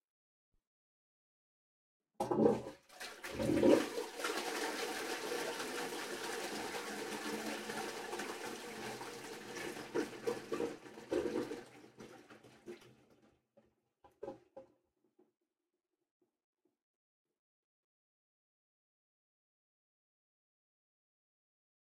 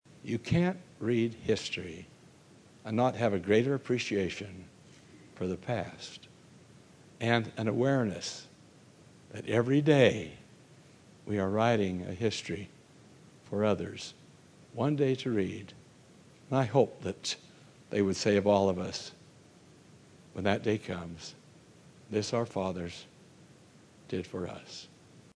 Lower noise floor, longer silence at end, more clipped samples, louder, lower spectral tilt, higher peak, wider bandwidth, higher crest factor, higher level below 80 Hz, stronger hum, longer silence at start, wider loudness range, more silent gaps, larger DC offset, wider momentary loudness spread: first, under -90 dBFS vs -58 dBFS; first, 7.35 s vs 0.5 s; neither; second, -39 LUFS vs -31 LUFS; second, -4 dB/octave vs -6 dB/octave; second, -14 dBFS vs -10 dBFS; first, 16 kHz vs 11 kHz; first, 28 dB vs 22 dB; second, -72 dBFS vs -66 dBFS; neither; first, 2.2 s vs 0.25 s; first, 23 LU vs 8 LU; neither; neither; first, 22 LU vs 18 LU